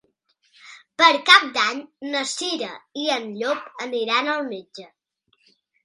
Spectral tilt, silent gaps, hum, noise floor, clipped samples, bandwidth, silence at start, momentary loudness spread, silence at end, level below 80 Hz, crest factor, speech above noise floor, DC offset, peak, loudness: -1 dB/octave; none; none; -67 dBFS; under 0.1%; 11.5 kHz; 0.65 s; 18 LU; 1 s; -76 dBFS; 24 dB; 46 dB; under 0.1%; 0 dBFS; -20 LUFS